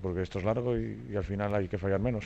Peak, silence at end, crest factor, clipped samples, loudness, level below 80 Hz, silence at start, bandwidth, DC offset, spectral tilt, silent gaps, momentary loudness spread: -18 dBFS; 0 s; 14 dB; under 0.1%; -32 LUFS; -48 dBFS; 0 s; 8 kHz; under 0.1%; -8.5 dB/octave; none; 5 LU